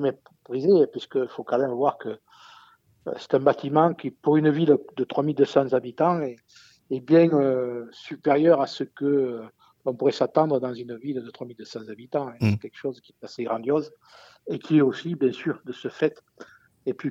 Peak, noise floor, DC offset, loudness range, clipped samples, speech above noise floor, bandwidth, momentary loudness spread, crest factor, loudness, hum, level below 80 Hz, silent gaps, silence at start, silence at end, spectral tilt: -6 dBFS; -56 dBFS; under 0.1%; 6 LU; under 0.1%; 32 dB; 7.6 kHz; 17 LU; 18 dB; -24 LUFS; none; -72 dBFS; none; 0 s; 0 s; -8 dB/octave